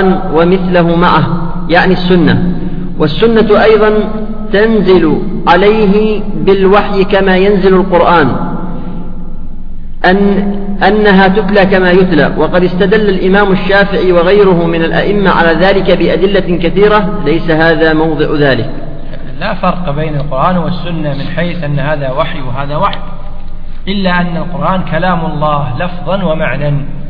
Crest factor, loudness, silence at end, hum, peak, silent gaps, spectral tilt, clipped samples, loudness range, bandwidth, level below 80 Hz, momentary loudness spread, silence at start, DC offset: 8 dB; -10 LUFS; 0 s; none; 0 dBFS; none; -9 dB/octave; 0.3%; 7 LU; 5.2 kHz; -18 dBFS; 12 LU; 0 s; under 0.1%